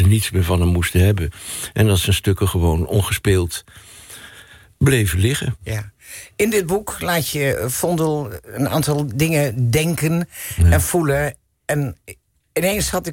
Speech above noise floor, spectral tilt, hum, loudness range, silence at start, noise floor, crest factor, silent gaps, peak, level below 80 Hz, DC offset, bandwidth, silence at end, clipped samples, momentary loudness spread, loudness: 26 dB; -5 dB/octave; none; 3 LU; 0 s; -44 dBFS; 14 dB; none; -4 dBFS; -32 dBFS; under 0.1%; 17 kHz; 0 s; under 0.1%; 12 LU; -19 LUFS